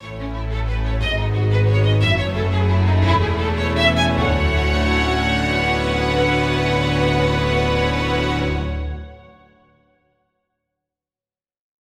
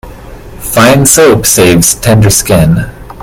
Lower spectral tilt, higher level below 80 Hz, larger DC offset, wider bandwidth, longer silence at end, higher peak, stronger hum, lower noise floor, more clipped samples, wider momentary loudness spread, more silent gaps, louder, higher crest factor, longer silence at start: first, -6 dB/octave vs -4 dB/octave; about the same, -28 dBFS vs -26 dBFS; neither; second, 11 kHz vs over 20 kHz; first, 2.8 s vs 0 s; about the same, -2 dBFS vs 0 dBFS; neither; first, under -90 dBFS vs -27 dBFS; second, under 0.1% vs 2%; about the same, 8 LU vs 9 LU; neither; second, -19 LUFS vs -6 LUFS; first, 16 dB vs 8 dB; about the same, 0 s vs 0.05 s